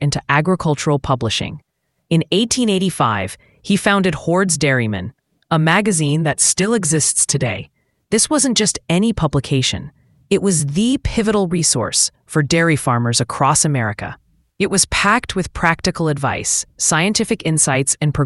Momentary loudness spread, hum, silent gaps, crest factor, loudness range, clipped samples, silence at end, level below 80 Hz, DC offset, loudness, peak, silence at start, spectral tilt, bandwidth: 7 LU; none; none; 18 dB; 2 LU; under 0.1%; 0 s; -40 dBFS; under 0.1%; -16 LUFS; 0 dBFS; 0 s; -4 dB/octave; 12 kHz